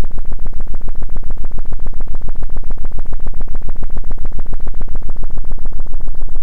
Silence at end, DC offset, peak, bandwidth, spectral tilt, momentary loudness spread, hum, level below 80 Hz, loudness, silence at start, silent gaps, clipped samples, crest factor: 0 s; 5%; -2 dBFS; 1.2 kHz; -9 dB/octave; 1 LU; none; -16 dBFS; -28 LUFS; 0 s; none; under 0.1%; 4 dB